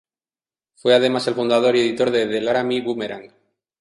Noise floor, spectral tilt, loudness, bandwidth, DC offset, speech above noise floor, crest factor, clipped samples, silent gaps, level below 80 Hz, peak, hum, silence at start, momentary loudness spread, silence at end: under -90 dBFS; -5 dB/octave; -19 LUFS; 11.5 kHz; under 0.1%; over 71 dB; 18 dB; under 0.1%; none; -64 dBFS; -2 dBFS; none; 0.85 s; 10 LU; 0.55 s